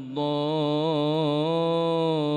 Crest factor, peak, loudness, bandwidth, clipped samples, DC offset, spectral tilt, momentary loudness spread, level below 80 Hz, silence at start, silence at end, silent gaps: 10 dB; -14 dBFS; -25 LUFS; 9.6 kHz; under 0.1%; under 0.1%; -8 dB/octave; 2 LU; -72 dBFS; 0 s; 0 s; none